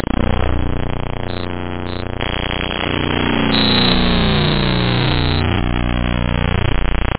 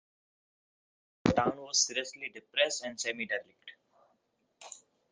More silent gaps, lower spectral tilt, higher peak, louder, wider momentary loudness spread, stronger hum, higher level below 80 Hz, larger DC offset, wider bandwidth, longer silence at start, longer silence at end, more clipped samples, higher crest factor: neither; first, -10 dB/octave vs -2.5 dB/octave; first, 0 dBFS vs -10 dBFS; first, -17 LUFS vs -32 LUFS; second, 12 LU vs 23 LU; first, 60 Hz at -30 dBFS vs none; first, -24 dBFS vs -62 dBFS; neither; second, 4 kHz vs 10 kHz; second, 0.2 s vs 1.25 s; second, 0.05 s vs 0.35 s; neither; second, 16 dB vs 26 dB